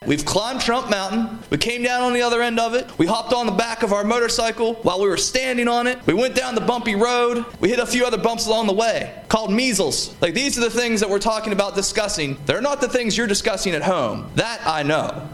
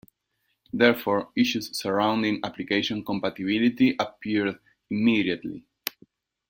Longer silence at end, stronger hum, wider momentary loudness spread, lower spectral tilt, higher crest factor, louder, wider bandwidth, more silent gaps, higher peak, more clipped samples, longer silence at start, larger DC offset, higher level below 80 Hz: second, 0 s vs 0.6 s; neither; second, 4 LU vs 13 LU; second, -3.5 dB/octave vs -5 dB/octave; about the same, 20 dB vs 22 dB; first, -20 LUFS vs -25 LUFS; second, 14 kHz vs 16.5 kHz; neither; about the same, -2 dBFS vs -4 dBFS; neither; second, 0 s vs 0.75 s; neither; first, -44 dBFS vs -64 dBFS